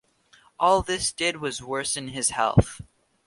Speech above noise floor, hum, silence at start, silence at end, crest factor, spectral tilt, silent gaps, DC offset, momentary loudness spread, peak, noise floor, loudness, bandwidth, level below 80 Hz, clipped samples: 34 dB; none; 0.6 s; 0.45 s; 24 dB; -4 dB/octave; none; under 0.1%; 9 LU; -2 dBFS; -59 dBFS; -24 LUFS; 11.5 kHz; -42 dBFS; under 0.1%